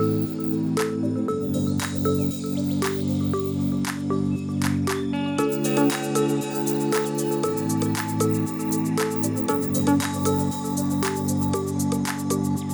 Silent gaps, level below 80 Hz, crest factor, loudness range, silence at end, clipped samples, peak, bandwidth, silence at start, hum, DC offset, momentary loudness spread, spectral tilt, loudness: none; -62 dBFS; 16 dB; 1 LU; 0 s; under 0.1%; -8 dBFS; over 20 kHz; 0 s; none; under 0.1%; 3 LU; -5.5 dB/octave; -24 LUFS